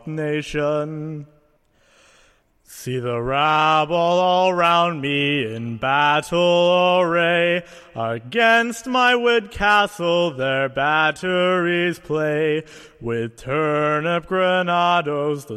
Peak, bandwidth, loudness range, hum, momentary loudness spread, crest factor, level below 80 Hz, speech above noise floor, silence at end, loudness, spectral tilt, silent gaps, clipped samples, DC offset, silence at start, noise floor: -4 dBFS; 14 kHz; 4 LU; none; 11 LU; 16 dB; -50 dBFS; 40 dB; 0 s; -19 LUFS; -5 dB/octave; none; under 0.1%; under 0.1%; 0.05 s; -60 dBFS